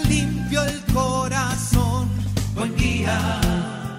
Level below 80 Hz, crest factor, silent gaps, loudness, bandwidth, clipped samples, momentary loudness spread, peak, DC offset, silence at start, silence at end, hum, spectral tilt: -30 dBFS; 16 dB; none; -22 LUFS; 16 kHz; under 0.1%; 4 LU; -4 dBFS; under 0.1%; 0 s; 0 s; none; -5 dB/octave